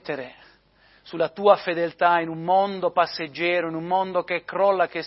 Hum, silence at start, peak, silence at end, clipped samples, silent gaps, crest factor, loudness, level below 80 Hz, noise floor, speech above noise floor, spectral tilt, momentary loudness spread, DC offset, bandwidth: none; 0.05 s; -4 dBFS; 0 s; under 0.1%; none; 20 dB; -23 LUFS; -68 dBFS; -58 dBFS; 35 dB; -8.5 dB/octave; 8 LU; under 0.1%; 5.8 kHz